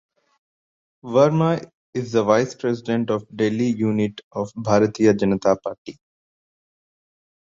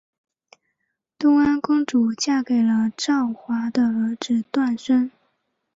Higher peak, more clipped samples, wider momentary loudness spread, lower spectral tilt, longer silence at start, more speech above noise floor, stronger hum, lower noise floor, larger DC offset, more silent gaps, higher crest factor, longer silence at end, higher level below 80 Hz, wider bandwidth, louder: first, -4 dBFS vs -8 dBFS; neither; first, 12 LU vs 6 LU; first, -7 dB/octave vs -4.5 dB/octave; second, 1.05 s vs 1.2 s; first, over 70 dB vs 56 dB; neither; first, under -90 dBFS vs -76 dBFS; neither; first, 1.74-1.93 s, 4.23-4.31 s, 5.78-5.85 s vs none; about the same, 18 dB vs 14 dB; first, 1.55 s vs 0.65 s; about the same, -58 dBFS vs -62 dBFS; about the same, 7.6 kHz vs 7.8 kHz; about the same, -21 LUFS vs -21 LUFS